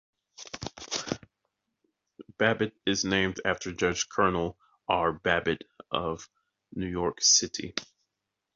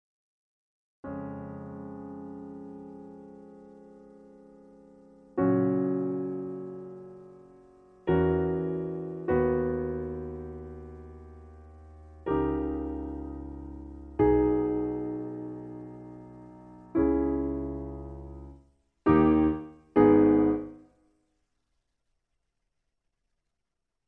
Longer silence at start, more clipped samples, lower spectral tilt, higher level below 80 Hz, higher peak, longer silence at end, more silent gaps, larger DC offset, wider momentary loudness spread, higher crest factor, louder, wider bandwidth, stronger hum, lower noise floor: second, 0.4 s vs 1.05 s; neither; second, -2.5 dB/octave vs -11 dB/octave; second, -54 dBFS vs -48 dBFS; about the same, -8 dBFS vs -10 dBFS; second, 0.7 s vs 3.3 s; neither; neither; second, 16 LU vs 24 LU; about the same, 24 dB vs 22 dB; about the same, -28 LUFS vs -28 LUFS; first, 7.6 kHz vs 3.5 kHz; neither; about the same, -85 dBFS vs -85 dBFS